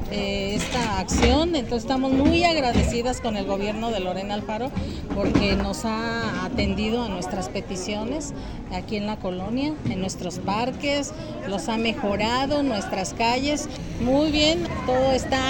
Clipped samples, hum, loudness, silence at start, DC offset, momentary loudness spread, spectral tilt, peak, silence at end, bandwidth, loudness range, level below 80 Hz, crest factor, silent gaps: under 0.1%; none; -24 LUFS; 0 s; under 0.1%; 10 LU; -5 dB/octave; -4 dBFS; 0 s; 17 kHz; 6 LU; -36 dBFS; 20 dB; none